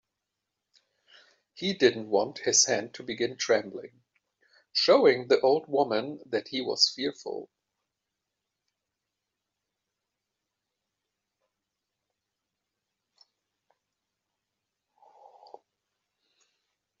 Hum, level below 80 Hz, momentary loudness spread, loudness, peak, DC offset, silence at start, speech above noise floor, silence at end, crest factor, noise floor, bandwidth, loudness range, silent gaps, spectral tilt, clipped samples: none; -78 dBFS; 14 LU; -26 LUFS; -8 dBFS; under 0.1%; 1.55 s; 59 dB; 9.55 s; 24 dB; -86 dBFS; 7.6 kHz; 7 LU; none; -1.5 dB/octave; under 0.1%